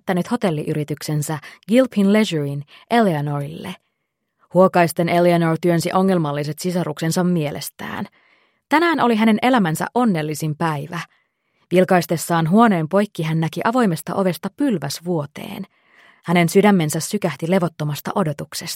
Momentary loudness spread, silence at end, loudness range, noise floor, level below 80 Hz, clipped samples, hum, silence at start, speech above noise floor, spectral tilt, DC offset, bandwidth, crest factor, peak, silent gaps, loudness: 14 LU; 0 s; 3 LU; -75 dBFS; -64 dBFS; under 0.1%; none; 0.05 s; 56 dB; -6 dB/octave; under 0.1%; 16.5 kHz; 18 dB; -2 dBFS; none; -19 LUFS